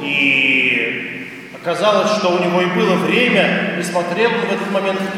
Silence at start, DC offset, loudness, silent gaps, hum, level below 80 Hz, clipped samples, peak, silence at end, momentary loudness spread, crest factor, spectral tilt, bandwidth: 0 s; under 0.1%; -15 LUFS; none; none; -64 dBFS; under 0.1%; 0 dBFS; 0 s; 11 LU; 16 dB; -5 dB/octave; 15.5 kHz